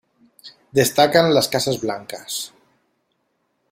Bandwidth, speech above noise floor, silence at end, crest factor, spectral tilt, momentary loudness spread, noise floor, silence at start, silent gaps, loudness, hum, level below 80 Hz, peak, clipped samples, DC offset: 16.5 kHz; 52 dB; 1.25 s; 20 dB; -3.5 dB/octave; 13 LU; -70 dBFS; 0.45 s; none; -19 LUFS; none; -60 dBFS; -2 dBFS; under 0.1%; under 0.1%